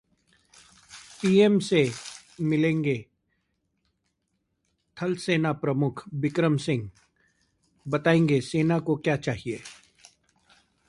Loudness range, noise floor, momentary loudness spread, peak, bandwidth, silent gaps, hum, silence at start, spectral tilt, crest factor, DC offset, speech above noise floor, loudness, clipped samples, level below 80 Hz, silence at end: 5 LU; -77 dBFS; 17 LU; -6 dBFS; 11.5 kHz; none; none; 0.9 s; -6.5 dB/octave; 20 dB; under 0.1%; 53 dB; -25 LUFS; under 0.1%; -62 dBFS; 1.15 s